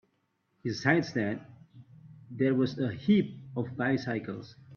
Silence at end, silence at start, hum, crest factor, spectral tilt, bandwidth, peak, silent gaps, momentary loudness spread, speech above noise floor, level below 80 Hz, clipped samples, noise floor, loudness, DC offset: 0 s; 0.65 s; none; 22 dB; -7 dB/octave; 6.8 kHz; -10 dBFS; none; 14 LU; 46 dB; -68 dBFS; under 0.1%; -75 dBFS; -30 LUFS; under 0.1%